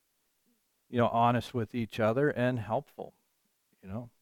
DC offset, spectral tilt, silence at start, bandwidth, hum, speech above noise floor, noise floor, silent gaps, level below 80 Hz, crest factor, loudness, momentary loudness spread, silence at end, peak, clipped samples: under 0.1%; -7.5 dB/octave; 0.9 s; 16 kHz; none; 46 dB; -76 dBFS; none; -66 dBFS; 18 dB; -30 LUFS; 18 LU; 0.15 s; -14 dBFS; under 0.1%